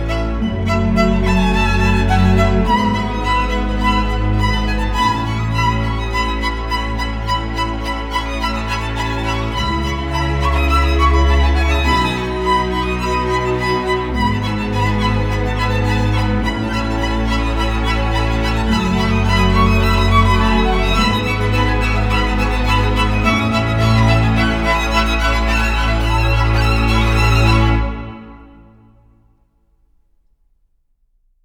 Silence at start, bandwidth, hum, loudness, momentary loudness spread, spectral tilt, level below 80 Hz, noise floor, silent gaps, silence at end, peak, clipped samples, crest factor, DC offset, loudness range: 0 s; 15.5 kHz; none; -16 LUFS; 6 LU; -6 dB/octave; -20 dBFS; -60 dBFS; none; 3 s; 0 dBFS; under 0.1%; 14 dB; under 0.1%; 5 LU